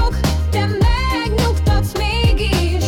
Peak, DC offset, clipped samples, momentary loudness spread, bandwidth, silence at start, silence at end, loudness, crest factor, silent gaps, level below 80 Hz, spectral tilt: -6 dBFS; under 0.1%; under 0.1%; 2 LU; 17.5 kHz; 0 s; 0 s; -17 LUFS; 10 dB; none; -20 dBFS; -5.5 dB/octave